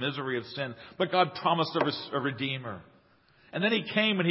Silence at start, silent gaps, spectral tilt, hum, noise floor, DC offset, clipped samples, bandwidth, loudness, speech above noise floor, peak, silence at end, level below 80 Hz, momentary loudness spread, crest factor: 0 s; none; -9.5 dB/octave; none; -62 dBFS; under 0.1%; under 0.1%; 5.8 kHz; -29 LUFS; 33 dB; -8 dBFS; 0 s; -70 dBFS; 11 LU; 22 dB